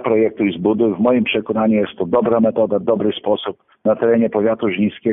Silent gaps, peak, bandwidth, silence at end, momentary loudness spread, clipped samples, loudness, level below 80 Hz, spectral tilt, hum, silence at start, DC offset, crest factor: none; -4 dBFS; 3.8 kHz; 0 s; 5 LU; under 0.1%; -17 LUFS; -56 dBFS; -11.5 dB/octave; none; 0 s; under 0.1%; 12 dB